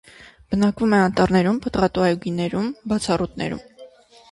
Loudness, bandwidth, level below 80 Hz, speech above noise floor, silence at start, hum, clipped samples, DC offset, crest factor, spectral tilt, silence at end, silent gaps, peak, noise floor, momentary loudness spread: -21 LUFS; 11.5 kHz; -46 dBFS; 26 dB; 0.2 s; none; under 0.1%; under 0.1%; 16 dB; -6.5 dB/octave; 0.45 s; none; -4 dBFS; -46 dBFS; 9 LU